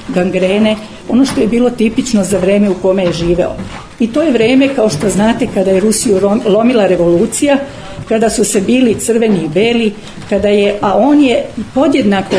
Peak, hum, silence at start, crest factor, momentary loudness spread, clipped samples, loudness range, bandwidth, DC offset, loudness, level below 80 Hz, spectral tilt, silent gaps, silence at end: 0 dBFS; none; 0 s; 10 dB; 6 LU; under 0.1%; 2 LU; 11 kHz; under 0.1%; -11 LUFS; -36 dBFS; -5 dB/octave; none; 0 s